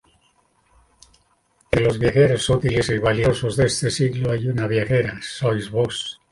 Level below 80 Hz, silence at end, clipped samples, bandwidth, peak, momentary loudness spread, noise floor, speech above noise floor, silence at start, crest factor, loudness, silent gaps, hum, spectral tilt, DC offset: -42 dBFS; 0.2 s; under 0.1%; 11.5 kHz; -2 dBFS; 6 LU; -62 dBFS; 43 dB; 1.7 s; 18 dB; -20 LUFS; none; none; -5.5 dB/octave; under 0.1%